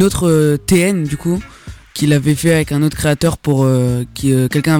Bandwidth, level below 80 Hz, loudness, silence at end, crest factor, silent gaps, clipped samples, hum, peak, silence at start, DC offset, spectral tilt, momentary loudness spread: 19 kHz; -36 dBFS; -15 LUFS; 0 s; 12 dB; none; under 0.1%; none; -2 dBFS; 0 s; under 0.1%; -6 dB/octave; 6 LU